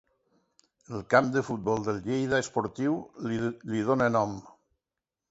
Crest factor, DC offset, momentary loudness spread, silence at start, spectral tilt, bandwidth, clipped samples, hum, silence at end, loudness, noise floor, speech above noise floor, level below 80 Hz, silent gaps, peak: 24 dB; under 0.1%; 9 LU; 0.9 s; -6 dB/octave; 8 kHz; under 0.1%; none; 0.8 s; -28 LUFS; -89 dBFS; 61 dB; -62 dBFS; none; -6 dBFS